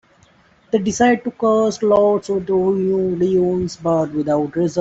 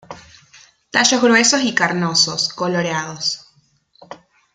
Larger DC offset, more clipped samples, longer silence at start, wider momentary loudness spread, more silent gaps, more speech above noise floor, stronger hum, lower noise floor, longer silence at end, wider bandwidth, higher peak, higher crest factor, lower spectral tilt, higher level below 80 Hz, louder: neither; neither; first, 0.75 s vs 0.1 s; second, 5 LU vs 10 LU; neither; second, 36 dB vs 41 dB; neither; second, -53 dBFS vs -58 dBFS; second, 0 s vs 0.4 s; second, 8 kHz vs 11 kHz; second, -4 dBFS vs 0 dBFS; second, 14 dB vs 20 dB; first, -6 dB/octave vs -2.5 dB/octave; first, -52 dBFS vs -62 dBFS; about the same, -18 LUFS vs -16 LUFS